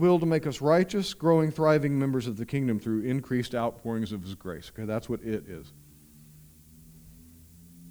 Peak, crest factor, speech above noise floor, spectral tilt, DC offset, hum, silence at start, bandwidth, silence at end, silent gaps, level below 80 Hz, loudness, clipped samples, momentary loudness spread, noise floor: -10 dBFS; 18 dB; 27 dB; -7 dB/octave; under 0.1%; none; 0 s; over 20 kHz; 0 s; none; -58 dBFS; -28 LUFS; under 0.1%; 14 LU; -53 dBFS